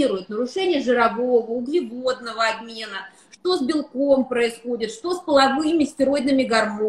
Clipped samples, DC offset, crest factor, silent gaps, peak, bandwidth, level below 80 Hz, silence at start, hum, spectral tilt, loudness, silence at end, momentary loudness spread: under 0.1%; under 0.1%; 18 dB; none; -4 dBFS; 12.5 kHz; -60 dBFS; 0 s; none; -4 dB/octave; -21 LUFS; 0 s; 10 LU